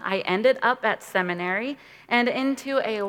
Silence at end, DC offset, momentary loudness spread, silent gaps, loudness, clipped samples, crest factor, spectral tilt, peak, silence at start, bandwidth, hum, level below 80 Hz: 0 s; under 0.1%; 6 LU; none; -24 LUFS; under 0.1%; 20 dB; -5 dB/octave; -6 dBFS; 0 s; 16.5 kHz; none; -70 dBFS